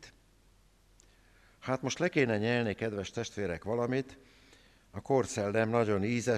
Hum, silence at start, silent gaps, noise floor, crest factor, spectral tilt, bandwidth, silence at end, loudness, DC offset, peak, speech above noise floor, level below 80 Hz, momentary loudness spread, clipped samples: none; 0 s; none; -64 dBFS; 18 dB; -5.5 dB/octave; 13 kHz; 0 s; -32 LUFS; under 0.1%; -14 dBFS; 33 dB; -64 dBFS; 9 LU; under 0.1%